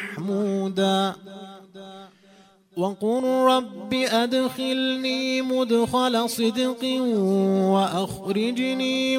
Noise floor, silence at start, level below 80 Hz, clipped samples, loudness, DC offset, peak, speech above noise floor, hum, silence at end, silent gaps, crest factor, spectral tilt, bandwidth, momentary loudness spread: -54 dBFS; 0 s; -64 dBFS; under 0.1%; -23 LUFS; under 0.1%; -8 dBFS; 32 dB; none; 0 s; none; 16 dB; -5 dB/octave; 16 kHz; 15 LU